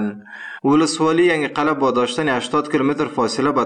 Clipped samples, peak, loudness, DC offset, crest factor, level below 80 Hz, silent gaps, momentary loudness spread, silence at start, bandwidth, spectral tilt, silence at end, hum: under 0.1%; -4 dBFS; -18 LUFS; under 0.1%; 14 dB; -58 dBFS; none; 7 LU; 0 s; 10 kHz; -5 dB/octave; 0 s; none